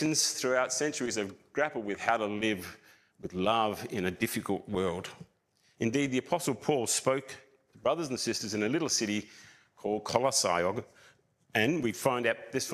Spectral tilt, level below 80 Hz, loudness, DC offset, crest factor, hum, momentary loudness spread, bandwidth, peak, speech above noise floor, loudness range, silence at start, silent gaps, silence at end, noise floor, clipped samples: -3.5 dB/octave; -68 dBFS; -31 LUFS; under 0.1%; 22 dB; none; 9 LU; 15.5 kHz; -10 dBFS; 39 dB; 2 LU; 0 s; none; 0 s; -70 dBFS; under 0.1%